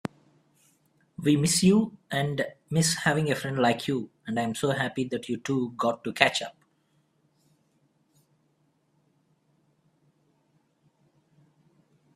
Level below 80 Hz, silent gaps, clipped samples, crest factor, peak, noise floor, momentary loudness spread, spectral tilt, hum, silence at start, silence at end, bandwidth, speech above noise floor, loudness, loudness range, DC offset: -64 dBFS; none; under 0.1%; 28 dB; 0 dBFS; -70 dBFS; 10 LU; -4.5 dB/octave; none; 0.05 s; 5.65 s; 15.5 kHz; 44 dB; -26 LUFS; 6 LU; under 0.1%